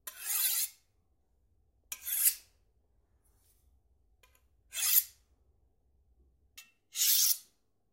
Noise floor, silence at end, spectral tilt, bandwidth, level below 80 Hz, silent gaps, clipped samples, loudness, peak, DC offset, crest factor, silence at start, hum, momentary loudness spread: -74 dBFS; 0.55 s; 4.5 dB/octave; 16 kHz; -72 dBFS; none; under 0.1%; -28 LUFS; -8 dBFS; under 0.1%; 28 dB; 0.05 s; none; 17 LU